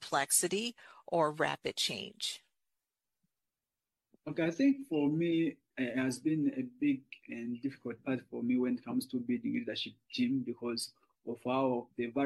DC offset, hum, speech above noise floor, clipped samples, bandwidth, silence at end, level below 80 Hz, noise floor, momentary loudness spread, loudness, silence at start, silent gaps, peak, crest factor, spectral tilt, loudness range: under 0.1%; none; over 56 dB; under 0.1%; 12.5 kHz; 0 s; -78 dBFS; under -90 dBFS; 11 LU; -34 LUFS; 0 s; none; -16 dBFS; 20 dB; -4 dB/octave; 4 LU